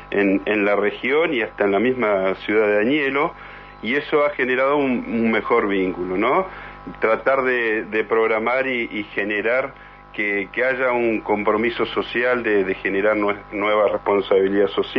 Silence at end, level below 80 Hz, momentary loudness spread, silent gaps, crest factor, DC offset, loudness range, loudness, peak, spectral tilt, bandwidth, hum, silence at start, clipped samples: 0 s; -50 dBFS; 5 LU; none; 16 dB; under 0.1%; 2 LU; -20 LUFS; -4 dBFS; -7.5 dB/octave; 6 kHz; 50 Hz at -50 dBFS; 0 s; under 0.1%